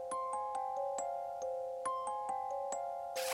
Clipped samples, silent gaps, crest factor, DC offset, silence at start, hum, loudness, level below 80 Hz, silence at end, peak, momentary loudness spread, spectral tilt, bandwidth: under 0.1%; none; 16 dB; under 0.1%; 0 s; none; -39 LUFS; -76 dBFS; 0 s; -24 dBFS; 2 LU; -1 dB/octave; 16 kHz